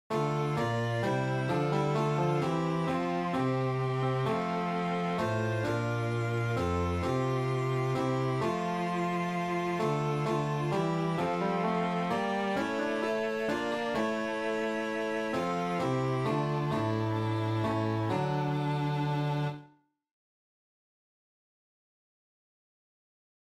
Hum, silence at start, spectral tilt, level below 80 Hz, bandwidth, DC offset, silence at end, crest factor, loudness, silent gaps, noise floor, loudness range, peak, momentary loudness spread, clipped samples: none; 0.1 s; -7 dB/octave; -58 dBFS; 13.5 kHz; under 0.1%; 3.8 s; 14 dB; -31 LUFS; none; -60 dBFS; 2 LU; -18 dBFS; 2 LU; under 0.1%